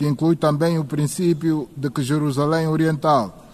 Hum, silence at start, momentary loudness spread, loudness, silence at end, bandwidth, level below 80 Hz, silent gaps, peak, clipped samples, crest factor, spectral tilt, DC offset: none; 0 s; 5 LU; -20 LUFS; 0.15 s; 13.5 kHz; -54 dBFS; none; -6 dBFS; under 0.1%; 14 dB; -7 dB/octave; 0.1%